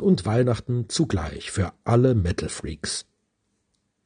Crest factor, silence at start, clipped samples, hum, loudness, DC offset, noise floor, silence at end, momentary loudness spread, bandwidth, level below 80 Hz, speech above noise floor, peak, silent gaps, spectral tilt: 18 dB; 0 s; under 0.1%; none; -24 LUFS; under 0.1%; -73 dBFS; 1.05 s; 10 LU; 10 kHz; -46 dBFS; 50 dB; -6 dBFS; none; -6 dB/octave